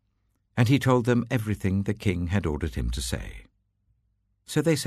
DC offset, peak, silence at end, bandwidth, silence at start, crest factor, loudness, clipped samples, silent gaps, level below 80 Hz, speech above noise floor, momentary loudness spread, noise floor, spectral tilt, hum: under 0.1%; -10 dBFS; 0 s; 13.5 kHz; 0.55 s; 18 dB; -26 LUFS; under 0.1%; none; -40 dBFS; 47 dB; 10 LU; -72 dBFS; -6 dB/octave; none